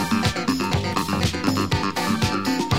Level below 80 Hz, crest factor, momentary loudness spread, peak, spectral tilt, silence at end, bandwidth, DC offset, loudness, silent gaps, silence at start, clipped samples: -40 dBFS; 16 dB; 1 LU; -6 dBFS; -5 dB/octave; 0 s; 16 kHz; 0.6%; -22 LUFS; none; 0 s; under 0.1%